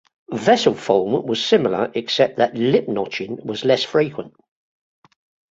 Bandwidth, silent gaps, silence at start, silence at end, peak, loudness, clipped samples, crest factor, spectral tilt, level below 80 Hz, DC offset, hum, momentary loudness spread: 7.8 kHz; none; 0.3 s; 1.2 s; -2 dBFS; -19 LUFS; under 0.1%; 18 dB; -5 dB/octave; -62 dBFS; under 0.1%; none; 10 LU